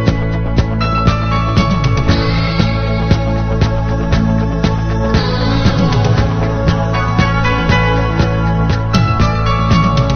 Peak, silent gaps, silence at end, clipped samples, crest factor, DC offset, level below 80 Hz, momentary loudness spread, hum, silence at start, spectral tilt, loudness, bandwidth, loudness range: 0 dBFS; none; 0 s; under 0.1%; 12 dB; under 0.1%; -20 dBFS; 3 LU; none; 0 s; -7 dB/octave; -14 LUFS; 6.6 kHz; 1 LU